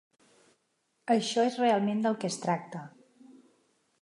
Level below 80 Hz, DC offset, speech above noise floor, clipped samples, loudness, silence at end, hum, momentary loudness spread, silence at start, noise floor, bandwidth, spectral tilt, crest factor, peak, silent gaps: -84 dBFS; under 0.1%; 48 dB; under 0.1%; -29 LUFS; 1.15 s; none; 18 LU; 1.05 s; -76 dBFS; 11.5 kHz; -5 dB/octave; 18 dB; -14 dBFS; none